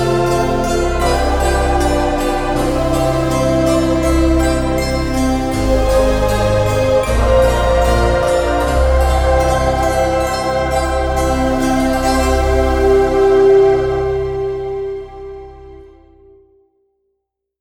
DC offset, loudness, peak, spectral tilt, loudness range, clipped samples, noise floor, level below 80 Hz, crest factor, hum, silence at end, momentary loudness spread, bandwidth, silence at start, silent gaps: under 0.1%; -15 LUFS; -2 dBFS; -6 dB/octave; 3 LU; under 0.1%; -73 dBFS; -20 dBFS; 14 dB; none; 1.75 s; 5 LU; 17 kHz; 0 s; none